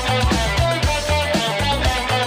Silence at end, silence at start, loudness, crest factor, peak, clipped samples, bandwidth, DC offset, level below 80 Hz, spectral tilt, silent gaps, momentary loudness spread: 0 s; 0 s; -19 LUFS; 12 dB; -8 dBFS; under 0.1%; 16 kHz; under 0.1%; -26 dBFS; -4 dB/octave; none; 1 LU